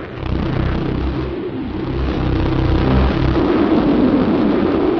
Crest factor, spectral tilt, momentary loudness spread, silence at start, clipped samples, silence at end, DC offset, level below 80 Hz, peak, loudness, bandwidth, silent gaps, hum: 12 dB; -9.5 dB/octave; 9 LU; 0 s; under 0.1%; 0 s; under 0.1%; -24 dBFS; -4 dBFS; -17 LUFS; 6.2 kHz; none; none